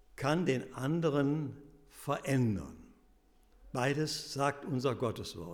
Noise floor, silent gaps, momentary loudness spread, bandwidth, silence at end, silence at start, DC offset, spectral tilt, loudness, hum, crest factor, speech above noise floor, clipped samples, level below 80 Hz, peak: -65 dBFS; none; 11 LU; 18 kHz; 0 s; 0.2 s; under 0.1%; -6 dB/octave; -34 LUFS; none; 16 dB; 32 dB; under 0.1%; -62 dBFS; -18 dBFS